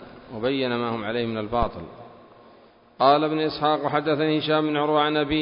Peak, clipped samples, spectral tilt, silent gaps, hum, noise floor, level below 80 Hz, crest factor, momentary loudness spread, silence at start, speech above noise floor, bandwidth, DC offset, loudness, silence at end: -4 dBFS; under 0.1%; -10 dB/octave; none; none; -53 dBFS; -46 dBFS; 20 dB; 9 LU; 0 s; 30 dB; 5.4 kHz; under 0.1%; -23 LUFS; 0 s